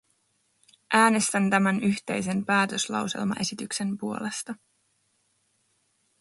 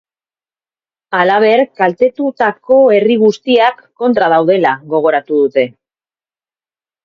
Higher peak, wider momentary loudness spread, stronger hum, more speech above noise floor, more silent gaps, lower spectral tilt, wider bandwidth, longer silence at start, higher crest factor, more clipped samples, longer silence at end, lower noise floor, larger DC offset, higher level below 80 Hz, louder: second, -6 dBFS vs 0 dBFS; first, 11 LU vs 6 LU; neither; second, 45 dB vs over 79 dB; neither; second, -4 dB/octave vs -6 dB/octave; first, 11.5 kHz vs 7 kHz; second, 0.9 s vs 1.1 s; first, 22 dB vs 12 dB; neither; first, 1.65 s vs 1.35 s; second, -71 dBFS vs under -90 dBFS; neither; second, -70 dBFS vs -60 dBFS; second, -25 LUFS vs -12 LUFS